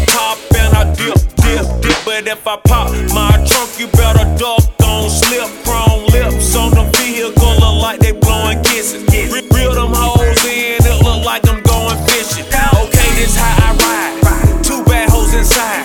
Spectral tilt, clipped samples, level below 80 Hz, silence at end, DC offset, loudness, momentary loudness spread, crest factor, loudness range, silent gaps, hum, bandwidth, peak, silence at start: -4 dB/octave; 0.5%; -14 dBFS; 0 s; under 0.1%; -11 LUFS; 4 LU; 10 dB; 1 LU; none; none; over 20 kHz; 0 dBFS; 0 s